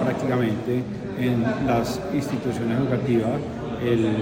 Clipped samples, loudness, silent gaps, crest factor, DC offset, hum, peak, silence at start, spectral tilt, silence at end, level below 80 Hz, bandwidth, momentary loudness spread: under 0.1%; -24 LUFS; none; 14 dB; under 0.1%; none; -10 dBFS; 0 s; -7.5 dB/octave; 0 s; -48 dBFS; 16.5 kHz; 5 LU